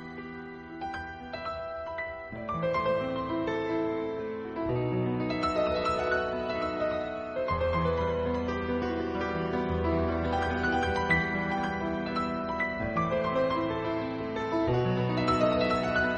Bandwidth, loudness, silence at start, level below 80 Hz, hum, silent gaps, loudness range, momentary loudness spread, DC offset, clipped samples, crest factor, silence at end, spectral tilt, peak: 8.8 kHz; -30 LUFS; 0 s; -46 dBFS; none; none; 3 LU; 10 LU; under 0.1%; under 0.1%; 18 dB; 0 s; -7 dB/octave; -12 dBFS